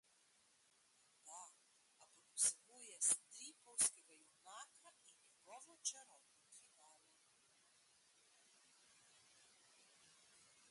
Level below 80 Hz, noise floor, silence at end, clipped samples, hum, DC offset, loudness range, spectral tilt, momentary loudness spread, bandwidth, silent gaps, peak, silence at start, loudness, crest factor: under -90 dBFS; -76 dBFS; 4.1 s; under 0.1%; none; under 0.1%; 13 LU; 2 dB/octave; 27 LU; 11.5 kHz; none; -24 dBFS; 1.25 s; -41 LUFS; 28 dB